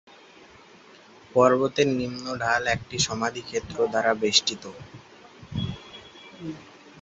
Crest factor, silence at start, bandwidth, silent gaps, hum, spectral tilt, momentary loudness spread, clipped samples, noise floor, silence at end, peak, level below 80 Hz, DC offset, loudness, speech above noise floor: 22 dB; 1.35 s; 8.2 kHz; none; none; -3.5 dB/octave; 23 LU; under 0.1%; -51 dBFS; 0.1 s; -4 dBFS; -54 dBFS; under 0.1%; -24 LUFS; 26 dB